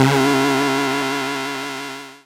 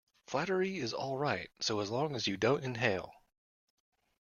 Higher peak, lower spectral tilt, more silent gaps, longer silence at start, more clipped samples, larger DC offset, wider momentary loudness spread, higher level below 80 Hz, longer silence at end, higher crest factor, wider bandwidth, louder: first, 0 dBFS vs -14 dBFS; about the same, -4.5 dB/octave vs -4.5 dB/octave; neither; second, 0 s vs 0.3 s; neither; neither; first, 12 LU vs 5 LU; first, -58 dBFS vs -70 dBFS; second, 0.1 s vs 1.1 s; about the same, 18 dB vs 22 dB; first, 17 kHz vs 11 kHz; first, -19 LUFS vs -34 LUFS